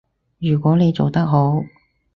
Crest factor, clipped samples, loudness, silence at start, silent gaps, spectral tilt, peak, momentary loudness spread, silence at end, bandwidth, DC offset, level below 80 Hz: 16 dB; under 0.1%; -18 LUFS; 0.4 s; none; -10 dB/octave; -2 dBFS; 9 LU; 0.5 s; 6 kHz; under 0.1%; -52 dBFS